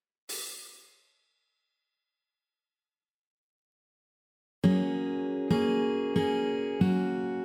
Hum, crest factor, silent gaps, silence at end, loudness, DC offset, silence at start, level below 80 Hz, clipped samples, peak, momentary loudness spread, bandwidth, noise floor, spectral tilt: none; 20 dB; 3.14-4.62 s; 0 s; -29 LUFS; under 0.1%; 0.3 s; -66 dBFS; under 0.1%; -12 dBFS; 12 LU; 17.5 kHz; under -90 dBFS; -6.5 dB/octave